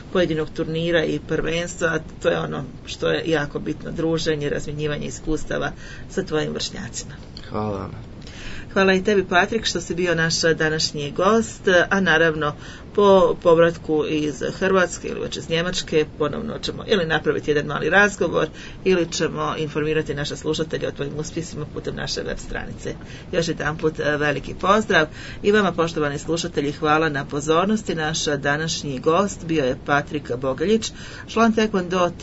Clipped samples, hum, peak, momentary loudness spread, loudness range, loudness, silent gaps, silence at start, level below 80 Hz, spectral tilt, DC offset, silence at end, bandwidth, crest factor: under 0.1%; none; -2 dBFS; 12 LU; 8 LU; -21 LUFS; none; 0 s; -42 dBFS; -4.5 dB/octave; under 0.1%; 0 s; 8 kHz; 18 dB